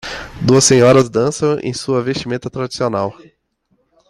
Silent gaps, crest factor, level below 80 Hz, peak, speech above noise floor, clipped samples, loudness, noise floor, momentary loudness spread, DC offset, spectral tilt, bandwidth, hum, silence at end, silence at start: none; 16 dB; -46 dBFS; 0 dBFS; 49 dB; under 0.1%; -15 LUFS; -63 dBFS; 14 LU; under 0.1%; -4.5 dB/octave; 13 kHz; none; 0.95 s; 0.05 s